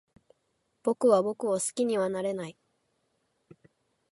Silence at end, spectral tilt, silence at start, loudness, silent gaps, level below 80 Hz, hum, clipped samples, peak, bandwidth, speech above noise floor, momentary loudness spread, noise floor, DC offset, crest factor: 1.6 s; -4.5 dB/octave; 0.85 s; -28 LUFS; none; -76 dBFS; none; under 0.1%; -10 dBFS; 11.5 kHz; 49 dB; 11 LU; -76 dBFS; under 0.1%; 22 dB